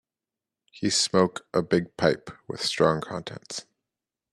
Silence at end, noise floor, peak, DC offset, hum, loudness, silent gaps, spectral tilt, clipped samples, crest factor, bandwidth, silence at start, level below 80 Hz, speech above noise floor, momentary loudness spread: 0.7 s; -90 dBFS; -6 dBFS; under 0.1%; none; -25 LUFS; none; -4 dB/octave; under 0.1%; 22 dB; 13 kHz; 0.75 s; -62 dBFS; 64 dB; 14 LU